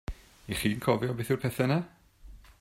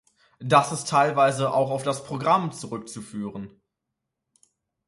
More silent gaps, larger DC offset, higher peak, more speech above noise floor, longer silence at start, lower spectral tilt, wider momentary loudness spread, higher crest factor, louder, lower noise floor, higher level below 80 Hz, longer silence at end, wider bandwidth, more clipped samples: neither; neither; second, -10 dBFS vs -4 dBFS; second, 23 dB vs 59 dB; second, 0.1 s vs 0.4 s; about the same, -6 dB/octave vs -5 dB/octave; about the same, 17 LU vs 16 LU; about the same, 20 dB vs 22 dB; second, -30 LUFS vs -23 LUFS; second, -51 dBFS vs -83 dBFS; first, -50 dBFS vs -66 dBFS; second, 0.1 s vs 1.4 s; first, 16 kHz vs 11.5 kHz; neither